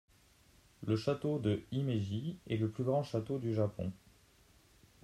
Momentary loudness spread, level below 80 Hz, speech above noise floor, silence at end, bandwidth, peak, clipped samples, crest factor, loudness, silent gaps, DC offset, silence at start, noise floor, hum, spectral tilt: 6 LU; -66 dBFS; 31 dB; 1.05 s; 13 kHz; -20 dBFS; under 0.1%; 18 dB; -36 LUFS; none; under 0.1%; 0.8 s; -66 dBFS; none; -8 dB/octave